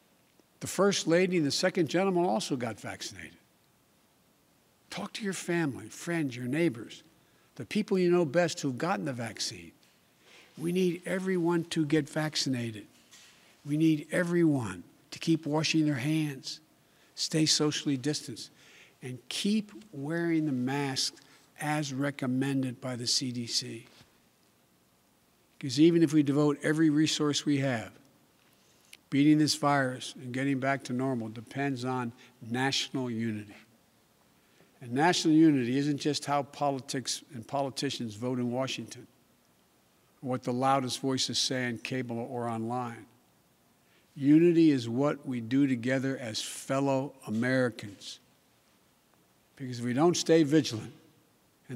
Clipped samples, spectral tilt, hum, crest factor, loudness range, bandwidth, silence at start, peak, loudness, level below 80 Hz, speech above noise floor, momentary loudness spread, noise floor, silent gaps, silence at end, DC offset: under 0.1%; -5 dB/octave; none; 18 dB; 7 LU; 15.5 kHz; 0.6 s; -12 dBFS; -29 LUFS; -78 dBFS; 38 dB; 16 LU; -67 dBFS; none; 0 s; under 0.1%